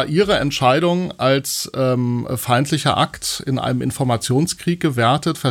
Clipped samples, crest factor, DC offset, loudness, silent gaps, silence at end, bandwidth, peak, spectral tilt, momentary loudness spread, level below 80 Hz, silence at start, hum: under 0.1%; 16 dB; under 0.1%; -18 LUFS; none; 0 s; 17.5 kHz; -2 dBFS; -5 dB/octave; 5 LU; -48 dBFS; 0 s; none